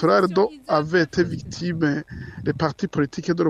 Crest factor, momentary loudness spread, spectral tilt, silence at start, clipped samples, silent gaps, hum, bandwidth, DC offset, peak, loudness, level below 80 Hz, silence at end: 16 dB; 10 LU; -6.5 dB/octave; 0 s; under 0.1%; none; none; 10 kHz; under 0.1%; -4 dBFS; -23 LUFS; -50 dBFS; 0 s